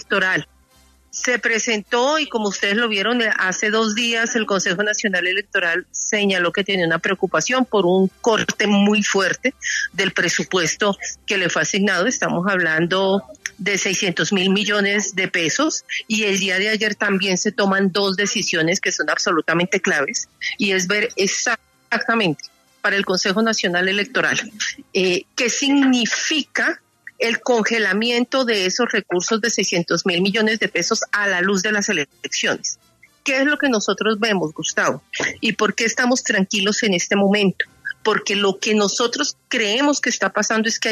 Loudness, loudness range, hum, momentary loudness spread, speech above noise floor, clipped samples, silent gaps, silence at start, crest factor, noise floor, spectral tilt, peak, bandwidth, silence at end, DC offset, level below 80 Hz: -19 LUFS; 1 LU; none; 5 LU; 35 dB; under 0.1%; none; 0.1 s; 14 dB; -54 dBFS; -3 dB/octave; -4 dBFS; 13.5 kHz; 0 s; under 0.1%; -64 dBFS